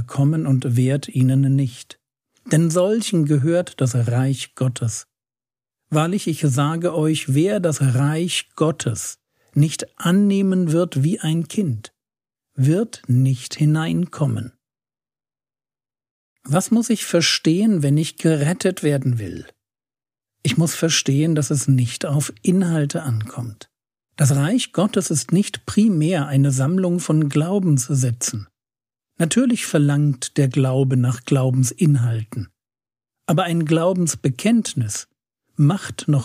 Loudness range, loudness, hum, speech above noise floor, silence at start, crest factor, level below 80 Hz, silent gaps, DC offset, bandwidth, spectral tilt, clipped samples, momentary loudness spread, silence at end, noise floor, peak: 3 LU; -19 LUFS; none; over 72 dB; 0 s; 16 dB; -62 dBFS; 16.11-16.36 s; under 0.1%; 15.5 kHz; -5.5 dB/octave; under 0.1%; 8 LU; 0 s; under -90 dBFS; -4 dBFS